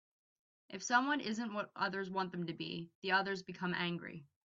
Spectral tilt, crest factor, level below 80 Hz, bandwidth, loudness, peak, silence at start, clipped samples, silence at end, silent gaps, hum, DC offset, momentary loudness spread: -2.5 dB/octave; 22 dB; -80 dBFS; 7.6 kHz; -38 LUFS; -18 dBFS; 0.7 s; under 0.1%; 0.2 s; 2.95-3.02 s; none; under 0.1%; 11 LU